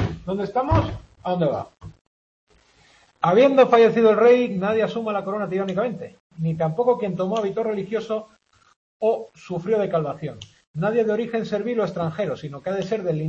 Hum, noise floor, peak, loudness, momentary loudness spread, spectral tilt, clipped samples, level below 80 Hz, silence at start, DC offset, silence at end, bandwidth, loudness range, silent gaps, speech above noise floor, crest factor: none; -56 dBFS; -4 dBFS; -22 LUFS; 15 LU; -7.5 dB/octave; under 0.1%; -46 dBFS; 0 s; under 0.1%; 0 s; 7.4 kHz; 8 LU; 2.01-2.47 s, 6.20-6.30 s, 8.76-9.00 s, 10.67-10.74 s; 35 dB; 18 dB